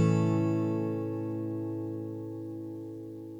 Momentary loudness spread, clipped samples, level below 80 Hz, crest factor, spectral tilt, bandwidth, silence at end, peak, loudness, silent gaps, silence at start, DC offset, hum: 13 LU; under 0.1%; -74 dBFS; 16 dB; -9 dB/octave; 9 kHz; 0 s; -14 dBFS; -33 LUFS; none; 0 s; under 0.1%; none